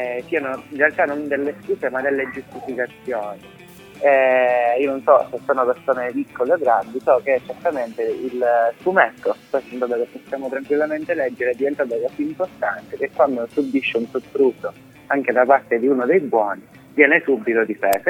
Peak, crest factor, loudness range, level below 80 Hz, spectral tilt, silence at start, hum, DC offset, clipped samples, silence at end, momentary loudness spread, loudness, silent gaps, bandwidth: 0 dBFS; 20 dB; 5 LU; -64 dBFS; -5.5 dB/octave; 0 s; none; under 0.1%; under 0.1%; 0 s; 11 LU; -20 LUFS; none; 16.5 kHz